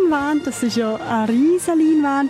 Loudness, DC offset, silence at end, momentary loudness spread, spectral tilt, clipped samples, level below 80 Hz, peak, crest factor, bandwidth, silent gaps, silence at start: -18 LUFS; under 0.1%; 0 s; 5 LU; -5 dB/octave; under 0.1%; -56 dBFS; -8 dBFS; 8 dB; 14.5 kHz; none; 0 s